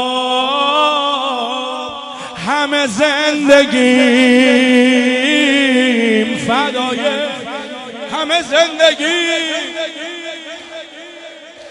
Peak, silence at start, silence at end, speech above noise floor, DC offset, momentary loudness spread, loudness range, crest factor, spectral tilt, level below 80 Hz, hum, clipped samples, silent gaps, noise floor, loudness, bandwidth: 0 dBFS; 0 s; 0 s; 22 dB; under 0.1%; 17 LU; 5 LU; 14 dB; -3 dB/octave; -58 dBFS; none; 0.2%; none; -34 dBFS; -13 LUFS; 11 kHz